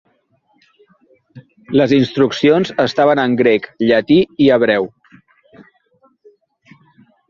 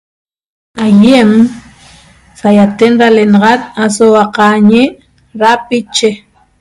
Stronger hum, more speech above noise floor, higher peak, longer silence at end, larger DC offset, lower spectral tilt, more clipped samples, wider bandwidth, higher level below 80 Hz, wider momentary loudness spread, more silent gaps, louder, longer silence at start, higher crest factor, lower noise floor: neither; first, 47 dB vs 33 dB; about the same, 0 dBFS vs 0 dBFS; first, 2.4 s vs 0.45 s; neither; about the same, -6.5 dB/octave vs -5.5 dB/octave; second, under 0.1% vs 3%; second, 7.2 kHz vs 11.5 kHz; second, -56 dBFS vs -48 dBFS; second, 5 LU vs 9 LU; neither; second, -14 LUFS vs -8 LUFS; first, 1.35 s vs 0.75 s; first, 16 dB vs 10 dB; first, -60 dBFS vs -40 dBFS